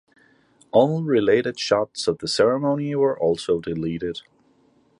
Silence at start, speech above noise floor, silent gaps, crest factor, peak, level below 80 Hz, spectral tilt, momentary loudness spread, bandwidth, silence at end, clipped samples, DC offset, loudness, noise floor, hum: 0.75 s; 39 dB; none; 18 dB; -4 dBFS; -56 dBFS; -5.5 dB/octave; 8 LU; 11.5 kHz; 0.8 s; under 0.1%; under 0.1%; -22 LUFS; -60 dBFS; none